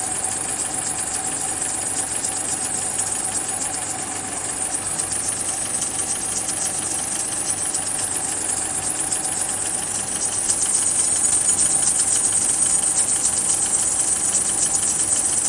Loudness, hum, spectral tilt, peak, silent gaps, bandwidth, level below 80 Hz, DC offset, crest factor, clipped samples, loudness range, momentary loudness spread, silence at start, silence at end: -19 LUFS; none; -0.5 dB/octave; -4 dBFS; none; 11.5 kHz; -52 dBFS; under 0.1%; 18 dB; under 0.1%; 6 LU; 6 LU; 0 s; 0 s